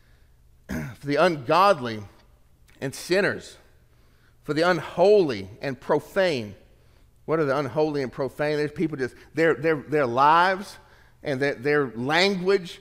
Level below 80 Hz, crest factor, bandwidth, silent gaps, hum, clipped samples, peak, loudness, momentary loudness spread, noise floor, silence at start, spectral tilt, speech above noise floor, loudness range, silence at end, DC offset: -56 dBFS; 20 dB; 16 kHz; none; none; under 0.1%; -6 dBFS; -23 LUFS; 15 LU; -57 dBFS; 0.7 s; -5.5 dB/octave; 34 dB; 4 LU; 0.05 s; under 0.1%